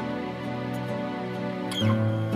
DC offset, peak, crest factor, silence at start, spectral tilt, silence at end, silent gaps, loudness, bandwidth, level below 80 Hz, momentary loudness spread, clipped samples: under 0.1%; -12 dBFS; 16 dB; 0 s; -6.5 dB/octave; 0 s; none; -29 LUFS; 15 kHz; -60 dBFS; 8 LU; under 0.1%